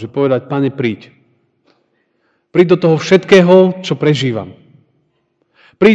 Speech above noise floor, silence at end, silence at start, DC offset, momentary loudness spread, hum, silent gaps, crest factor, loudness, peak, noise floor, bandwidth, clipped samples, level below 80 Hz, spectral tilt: 51 dB; 0 s; 0 s; under 0.1%; 12 LU; none; none; 14 dB; -12 LUFS; 0 dBFS; -63 dBFS; 8 kHz; 0.6%; -54 dBFS; -6.5 dB/octave